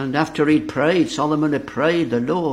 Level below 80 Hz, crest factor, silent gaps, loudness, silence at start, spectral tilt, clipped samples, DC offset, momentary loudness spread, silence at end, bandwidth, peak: -52 dBFS; 16 dB; none; -19 LUFS; 0 s; -6 dB/octave; under 0.1%; under 0.1%; 3 LU; 0 s; 11 kHz; -2 dBFS